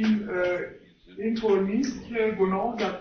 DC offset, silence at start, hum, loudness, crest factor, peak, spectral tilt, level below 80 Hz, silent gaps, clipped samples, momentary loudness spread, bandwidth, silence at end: under 0.1%; 0 s; none; -27 LUFS; 14 dB; -12 dBFS; -6.5 dB/octave; -56 dBFS; none; under 0.1%; 9 LU; 6.6 kHz; 0 s